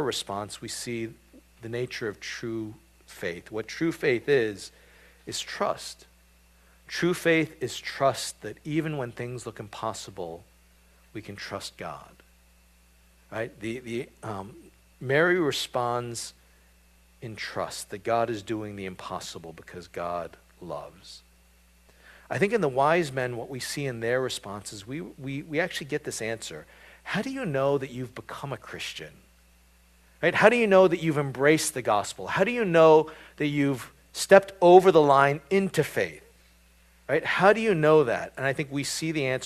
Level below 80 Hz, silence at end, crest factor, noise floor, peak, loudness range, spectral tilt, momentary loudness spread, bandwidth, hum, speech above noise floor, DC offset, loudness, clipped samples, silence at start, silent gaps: -60 dBFS; 0 s; 26 dB; -59 dBFS; -2 dBFS; 16 LU; -5 dB/octave; 20 LU; 14.5 kHz; none; 33 dB; under 0.1%; -26 LUFS; under 0.1%; 0 s; none